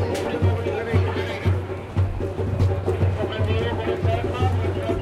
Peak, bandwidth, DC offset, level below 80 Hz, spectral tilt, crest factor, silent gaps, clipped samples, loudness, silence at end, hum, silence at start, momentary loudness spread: -6 dBFS; 10.5 kHz; under 0.1%; -40 dBFS; -7.5 dB/octave; 16 dB; none; under 0.1%; -24 LUFS; 0 s; none; 0 s; 3 LU